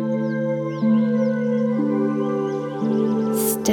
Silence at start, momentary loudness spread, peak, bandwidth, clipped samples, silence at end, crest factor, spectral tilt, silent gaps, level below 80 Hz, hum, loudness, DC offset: 0 s; 5 LU; -6 dBFS; 19.5 kHz; under 0.1%; 0 s; 14 dB; -6 dB/octave; none; -62 dBFS; none; -21 LUFS; under 0.1%